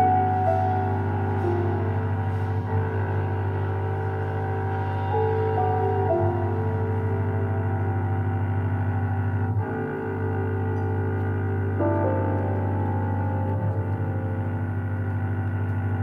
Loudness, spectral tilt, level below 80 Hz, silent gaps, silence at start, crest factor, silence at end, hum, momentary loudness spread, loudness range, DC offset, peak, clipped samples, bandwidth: -26 LUFS; -10.5 dB/octave; -56 dBFS; none; 0 s; 14 dB; 0 s; none; 4 LU; 2 LU; under 0.1%; -10 dBFS; under 0.1%; 3.6 kHz